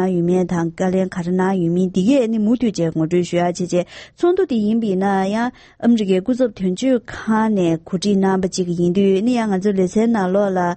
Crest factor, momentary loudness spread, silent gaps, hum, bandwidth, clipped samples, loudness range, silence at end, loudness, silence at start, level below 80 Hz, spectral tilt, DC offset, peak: 12 dB; 5 LU; none; none; 8.8 kHz; under 0.1%; 1 LU; 0 s; -18 LUFS; 0 s; -52 dBFS; -7 dB/octave; under 0.1%; -4 dBFS